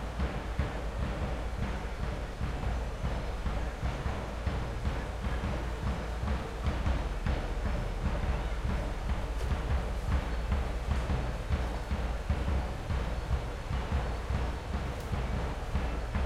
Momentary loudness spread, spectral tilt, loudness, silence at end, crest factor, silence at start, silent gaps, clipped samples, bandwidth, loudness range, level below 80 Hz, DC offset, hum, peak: 3 LU; -6.5 dB/octave; -35 LUFS; 0 s; 16 dB; 0 s; none; under 0.1%; 12.5 kHz; 2 LU; -34 dBFS; under 0.1%; none; -16 dBFS